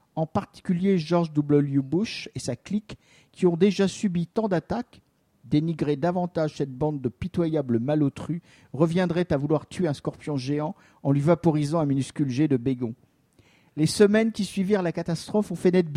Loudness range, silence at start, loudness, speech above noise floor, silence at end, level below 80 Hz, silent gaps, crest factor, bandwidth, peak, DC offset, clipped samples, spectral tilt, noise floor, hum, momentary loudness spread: 2 LU; 0.15 s; -25 LUFS; 36 dB; 0 s; -56 dBFS; none; 20 dB; 13 kHz; -4 dBFS; under 0.1%; under 0.1%; -7 dB/octave; -61 dBFS; none; 10 LU